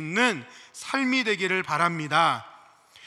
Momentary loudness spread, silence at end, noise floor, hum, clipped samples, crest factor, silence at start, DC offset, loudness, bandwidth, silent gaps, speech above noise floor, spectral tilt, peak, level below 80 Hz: 12 LU; 0 s; -53 dBFS; none; under 0.1%; 20 dB; 0 s; under 0.1%; -24 LUFS; 13 kHz; none; 27 dB; -4 dB/octave; -6 dBFS; -80 dBFS